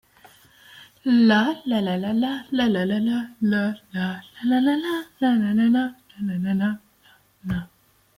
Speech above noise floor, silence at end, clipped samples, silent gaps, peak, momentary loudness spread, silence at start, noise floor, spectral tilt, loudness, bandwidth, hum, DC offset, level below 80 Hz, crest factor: 36 dB; 0.55 s; under 0.1%; none; -8 dBFS; 12 LU; 0.75 s; -57 dBFS; -7 dB/octave; -23 LUFS; 15.5 kHz; none; under 0.1%; -56 dBFS; 16 dB